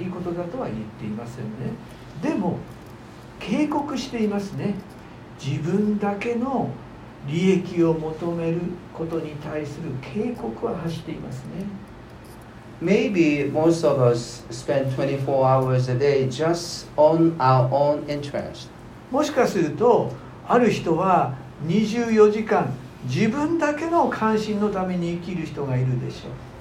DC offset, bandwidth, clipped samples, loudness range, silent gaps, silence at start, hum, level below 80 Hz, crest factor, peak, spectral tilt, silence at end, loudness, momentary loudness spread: under 0.1%; 15.5 kHz; under 0.1%; 8 LU; none; 0 s; none; -52 dBFS; 18 dB; -4 dBFS; -7 dB/octave; 0 s; -23 LUFS; 17 LU